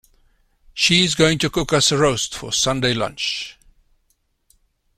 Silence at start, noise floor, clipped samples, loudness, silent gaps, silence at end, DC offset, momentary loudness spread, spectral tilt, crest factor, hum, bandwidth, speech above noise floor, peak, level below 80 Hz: 0.75 s; -67 dBFS; under 0.1%; -18 LUFS; none; 1.45 s; under 0.1%; 9 LU; -3 dB/octave; 18 dB; none; 16 kHz; 48 dB; -2 dBFS; -44 dBFS